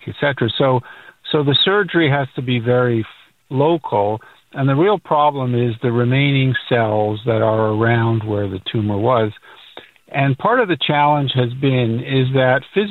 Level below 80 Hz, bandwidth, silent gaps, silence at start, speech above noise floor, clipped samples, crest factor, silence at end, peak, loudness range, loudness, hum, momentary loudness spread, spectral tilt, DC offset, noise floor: -54 dBFS; 4.4 kHz; none; 0.05 s; 25 dB; under 0.1%; 14 dB; 0 s; -2 dBFS; 2 LU; -17 LUFS; none; 7 LU; -9 dB/octave; under 0.1%; -42 dBFS